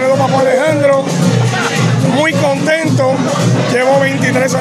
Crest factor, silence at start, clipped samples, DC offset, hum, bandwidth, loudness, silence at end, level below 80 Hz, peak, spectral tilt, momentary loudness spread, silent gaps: 10 dB; 0 s; under 0.1%; under 0.1%; none; 14.5 kHz; -12 LUFS; 0 s; -50 dBFS; 0 dBFS; -5.5 dB/octave; 2 LU; none